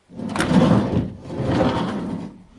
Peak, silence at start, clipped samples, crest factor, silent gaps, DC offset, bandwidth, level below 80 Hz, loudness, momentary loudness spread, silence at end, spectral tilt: -2 dBFS; 0.1 s; under 0.1%; 18 dB; none; under 0.1%; 11.5 kHz; -42 dBFS; -21 LUFS; 14 LU; 0.15 s; -7 dB/octave